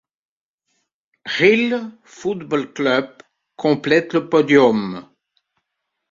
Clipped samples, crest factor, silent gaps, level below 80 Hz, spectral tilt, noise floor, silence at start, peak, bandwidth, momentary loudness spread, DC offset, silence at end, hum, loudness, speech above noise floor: under 0.1%; 18 dB; none; -62 dBFS; -6 dB/octave; -77 dBFS; 1.25 s; -2 dBFS; 7.6 kHz; 17 LU; under 0.1%; 1.1 s; none; -18 LUFS; 60 dB